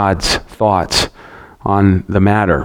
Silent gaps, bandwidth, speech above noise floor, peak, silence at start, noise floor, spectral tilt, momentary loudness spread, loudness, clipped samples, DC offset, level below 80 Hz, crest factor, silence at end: none; 17 kHz; 25 dB; 0 dBFS; 0 s; -38 dBFS; -5 dB/octave; 5 LU; -14 LUFS; under 0.1%; under 0.1%; -32 dBFS; 14 dB; 0 s